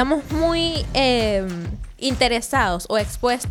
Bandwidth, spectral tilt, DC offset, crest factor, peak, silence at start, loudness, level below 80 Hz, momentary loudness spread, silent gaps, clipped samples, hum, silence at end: 17 kHz; -4 dB/octave; under 0.1%; 16 dB; -4 dBFS; 0 s; -21 LUFS; -34 dBFS; 8 LU; none; under 0.1%; none; 0 s